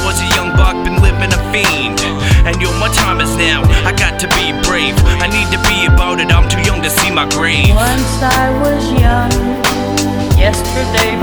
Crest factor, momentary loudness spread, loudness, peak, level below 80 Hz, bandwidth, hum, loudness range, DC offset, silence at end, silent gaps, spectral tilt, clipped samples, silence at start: 12 dB; 3 LU; -12 LUFS; 0 dBFS; -16 dBFS; over 20 kHz; none; 1 LU; under 0.1%; 0 s; none; -4 dB/octave; under 0.1%; 0 s